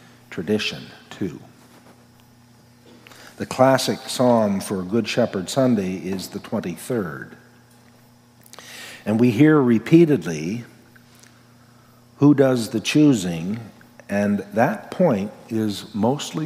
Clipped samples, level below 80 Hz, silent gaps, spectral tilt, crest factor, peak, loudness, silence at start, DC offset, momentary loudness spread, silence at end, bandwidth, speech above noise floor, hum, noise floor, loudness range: under 0.1%; -64 dBFS; none; -6 dB/octave; 20 dB; -2 dBFS; -20 LUFS; 0.3 s; under 0.1%; 17 LU; 0 s; 16 kHz; 32 dB; none; -52 dBFS; 7 LU